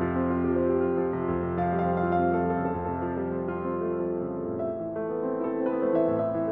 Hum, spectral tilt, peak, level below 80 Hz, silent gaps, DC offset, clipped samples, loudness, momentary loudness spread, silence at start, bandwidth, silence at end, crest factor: none; -12 dB/octave; -14 dBFS; -52 dBFS; none; under 0.1%; under 0.1%; -28 LUFS; 6 LU; 0 s; 3.8 kHz; 0 s; 14 dB